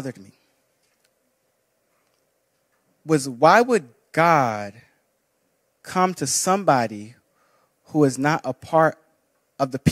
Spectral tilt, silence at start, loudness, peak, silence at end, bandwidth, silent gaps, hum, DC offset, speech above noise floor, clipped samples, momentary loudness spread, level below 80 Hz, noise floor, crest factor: -4.5 dB/octave; 0 s; -20 LUFS; -2 dBFS; 0 s; 16 kHz; none; none; under 0.1%; 50 dB; under 0.1%; 13 LU; -64 dBFS; -70 dBFS; 22 dB